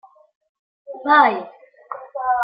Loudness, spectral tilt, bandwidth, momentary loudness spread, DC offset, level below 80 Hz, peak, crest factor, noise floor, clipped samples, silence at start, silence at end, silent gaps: -17 LUFS; -7.5 dB/octave; 5.2 kHz; 24 LU; under 0.1%; -70 dBFS; -2 dBFS; 20 dB; -37 dBFS; under 0.1%; 0.9 s; 0 s; none